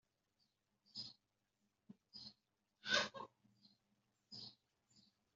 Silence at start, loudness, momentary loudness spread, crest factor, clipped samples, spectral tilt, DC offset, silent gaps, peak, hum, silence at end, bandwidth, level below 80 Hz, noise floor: 0.95 s; -44 LUFS; 20 LU; 28 dB; under 0.1%; 0.5 dB/octave; under 0.1%; none; -22 dBFS; none; 0.35 s; 7.4 kHz; -90 dBFS; -87 dBFS